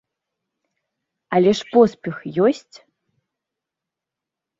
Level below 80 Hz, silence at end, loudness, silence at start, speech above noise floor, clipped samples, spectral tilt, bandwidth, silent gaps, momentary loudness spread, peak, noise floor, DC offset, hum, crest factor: -64 dBFS; 2 s; -18 LUFS; 1.3 s; 68 dB; under 0.1%; -6.5 dB/octave; 7.8 kHz; none; 12 LU; -2 dBFS; -86 dBFS; under 0.1%; none; 20 dB